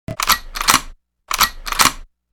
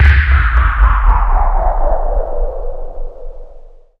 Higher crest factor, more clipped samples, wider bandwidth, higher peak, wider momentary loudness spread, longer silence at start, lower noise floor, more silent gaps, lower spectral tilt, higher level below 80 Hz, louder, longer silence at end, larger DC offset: first, 20 dB vs 12 dB; neither; first, over 20 kHz vs 4.9 kHz; about the same, 0 dBFS vs 0 dBFS; second, 2 LU vs 20 LU; about the same, 0.1 s vs 0 s; about the same, -38 dBFS vs -35 dBFS; neither; second, -0.5 dB/octave vs -8 dB/octave; second, -34 dBFS vs -12 dBFS; about the same, -16 LUFS vs -15 LUFS; about the same, 0.25 s vs 0.3 s; neither